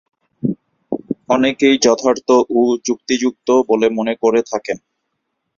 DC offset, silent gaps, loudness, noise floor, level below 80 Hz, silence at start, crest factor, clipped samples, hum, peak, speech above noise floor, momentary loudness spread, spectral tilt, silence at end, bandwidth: under 0.1%; none; -16 LUFS; -73 dBFS; -58 dBFS; 0.45 s; 16 dB; under 0.1%; none; -2 dBFS; 58 dB; 12 LU; -4 dB/octave; 0.8 s; 7.4 kHz